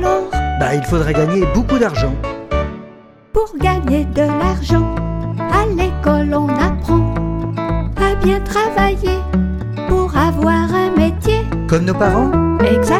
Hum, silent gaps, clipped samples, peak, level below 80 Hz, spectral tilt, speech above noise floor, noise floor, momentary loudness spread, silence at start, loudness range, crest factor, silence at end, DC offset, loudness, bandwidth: none; none; under 0.1%; 0 dBFS; -24 dBFS; -7 dB/octave; 26 dB; -40 dBFS; 7 LU; 0 s; 2 LU; 14 dB; 0 s; under 0.1%; -16 LUFS; 15 kHz